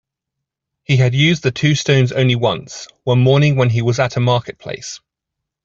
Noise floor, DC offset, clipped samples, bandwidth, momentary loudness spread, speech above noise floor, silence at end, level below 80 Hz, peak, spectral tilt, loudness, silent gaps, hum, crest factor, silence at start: -81 dBFS; under 0.1%; under 0.1%; 7.6 kHz; 15 LU; 66 dB; 0.7 s; -50 dBFS; -2 dBFS; -6 dB/octave; -15 LUFS; none; none; 14 dB; 0.9 s